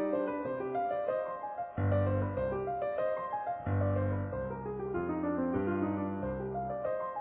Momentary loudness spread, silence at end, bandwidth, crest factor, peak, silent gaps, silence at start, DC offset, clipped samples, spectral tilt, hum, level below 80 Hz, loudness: 5 LU; 0 s; 4 kHz; 14 dB; -20 dBFS; none; 0 s; under 0.1%; under 0.1%; -9 dB/octave; none; -50 dBFS; -34 LUFS